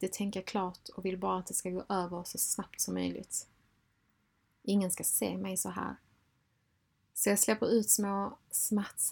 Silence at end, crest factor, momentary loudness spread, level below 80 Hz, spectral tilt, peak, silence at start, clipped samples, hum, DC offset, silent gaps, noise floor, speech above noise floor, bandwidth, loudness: 0 s; 22 dB; 11 LU; -68 dBFS; -3.5 dB/octave; -12 dBFS; 0 s; under 0.1%; none; under 0.1%; none; -75 dBFS; 42 dB; 19 kHz; -32 LUFS